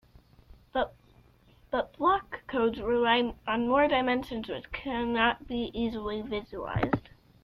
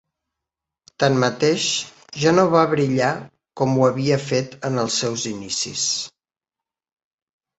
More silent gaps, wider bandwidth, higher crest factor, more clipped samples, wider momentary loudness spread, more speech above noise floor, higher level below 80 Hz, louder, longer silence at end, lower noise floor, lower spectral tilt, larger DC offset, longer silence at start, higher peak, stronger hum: neither; first, 11.5 kHz vs 8.4 kHz; about the same, 18 dB vs 20 dB; neither; about the same, 11 LU vs 9 LU; second, 31 dB vs 69 dB; first, -52 dBFS vs -60 dBFS; second, -29 LUFS vs -20 LUFS; second, 0.45 s vs 1.5 s; second, -60 dBFS vs -89 dBFS; first, -7 dB/octave vs -4 dB/octave; neither; second, 0.75 s vs 1 s; second, -12 dBFS vs -2 dBFS; neither